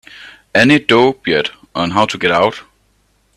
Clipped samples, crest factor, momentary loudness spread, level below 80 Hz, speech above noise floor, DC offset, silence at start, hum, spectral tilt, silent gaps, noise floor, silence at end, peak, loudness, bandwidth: under 0.1%; 16 dB; 10 LU; -52 dBFS; 45 dB; under 0.1%; 0.2 s; none; -5 dB/octave; none; -58 dBFS; 0.75 s; 0 dBFS; -13 LUFS; 13 kHz